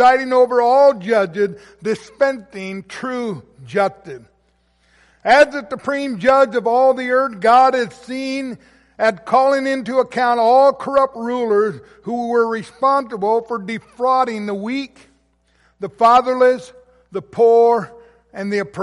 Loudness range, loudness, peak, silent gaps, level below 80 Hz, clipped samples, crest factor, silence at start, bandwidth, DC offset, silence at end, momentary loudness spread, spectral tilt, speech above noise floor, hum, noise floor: 6 LU; -16 LUFS; -2 dBFS; none; -58 dBFS; under 0.1%; 14 dB; 0 s; 11.5 kHz; under 0.1%; 0 s; 16 LU; -5 dB/octave; 44 dB; none; -61 dBFS